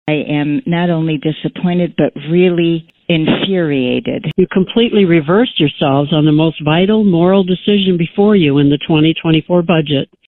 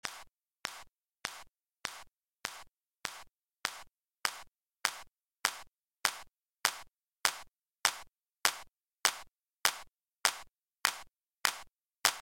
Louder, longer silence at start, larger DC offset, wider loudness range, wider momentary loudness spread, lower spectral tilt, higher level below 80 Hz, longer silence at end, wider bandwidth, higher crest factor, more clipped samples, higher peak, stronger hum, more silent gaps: first, -13 LUFS vs -35 LUFS; about the same, 0.05 s vs 0.05 s; neither; second, 3 LU vs 10 LU; second, 6 LU vs 17 LU; first, -10.5 dB/octave vs 1.5 dB/octave; first, -46 dBFS vs -72 dBFS; first, 0.25 s vs 0 s; second, 4.2 kHz vs 17 kHz; second, 12 dB vs 34 dB; neither; first, 0 dBFS vs -4 dBFS; neither; second, none vs 9.56-9.60 s, 11.22-11.26 s